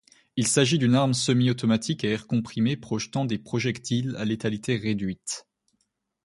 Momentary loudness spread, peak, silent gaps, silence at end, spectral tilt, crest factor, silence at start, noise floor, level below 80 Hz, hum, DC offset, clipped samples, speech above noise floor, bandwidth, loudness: 9 LU; -6 dBFS; none; 0.85 s; -5 dB/octave; 20 dB; 0.35 s; -75 dBFS; -58 dBFS; none; under 0.1%; under 0.1%; 50 dB; 11.5 kHz; -25 LUFS